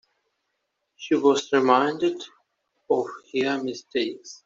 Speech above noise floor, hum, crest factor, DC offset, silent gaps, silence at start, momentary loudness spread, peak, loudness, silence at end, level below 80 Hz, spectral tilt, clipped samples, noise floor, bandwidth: 54 dB; none; 22 dB; under 0.1%; none; 1 s; 11 LU; -4 dBFS; -24 LUFS; 0.1 s; -72 dBFS; -4 dB/octave; under 0.1%; -78 dBFS; 7.8 kHz